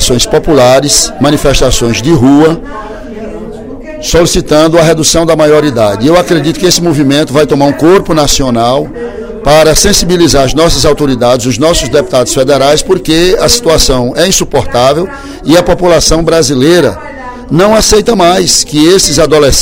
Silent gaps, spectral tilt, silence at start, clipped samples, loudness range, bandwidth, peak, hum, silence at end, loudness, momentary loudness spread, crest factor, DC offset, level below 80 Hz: none; -4 dB/octave; 0 s; 3%; 2 LU; over 20 kHz; 0 dBFS; none; 0 s; -6 LUFS; 13 LU; 6 dB; under 0.1%; -20 dBFS